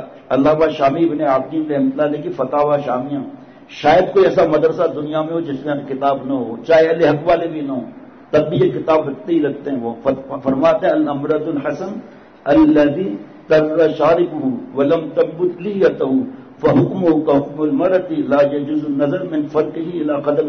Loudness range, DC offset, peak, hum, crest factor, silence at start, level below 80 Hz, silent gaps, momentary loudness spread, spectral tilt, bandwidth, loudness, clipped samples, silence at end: 2 LU; under 0.1%; -4 dBFS; none; 12 dB; 0 s; -50 dBFS; none; 10 LU; -8 dB/octave; 6.4 kHz; -17 LUFS; under 0.1%; 0 s